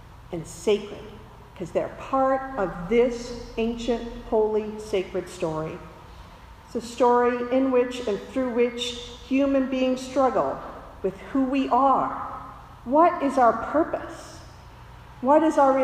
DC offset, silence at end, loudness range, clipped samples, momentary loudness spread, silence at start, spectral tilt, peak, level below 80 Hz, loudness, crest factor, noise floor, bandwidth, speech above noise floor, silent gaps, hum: under 0.1%; 0 s; 4 LU; under 0.1%; 17 LU; 0.05 s; -5.5 dB/octave; -6 dBFS; -48 dBFS; -24 LUFS; 18 dB; -46 dBFS; 13 kHz; 22 dB; none; none